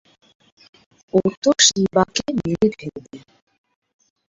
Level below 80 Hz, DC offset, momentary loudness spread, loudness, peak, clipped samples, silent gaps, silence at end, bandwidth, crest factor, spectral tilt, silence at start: -54 dBFS; under 0.1%; 19 LU; -18 LUFS; 0 dBFS; under 0.1%; 1.37-1.42 s; 1.15 s; 7.8 kHz; 22 dB; -3 dB/octave; 1.15 s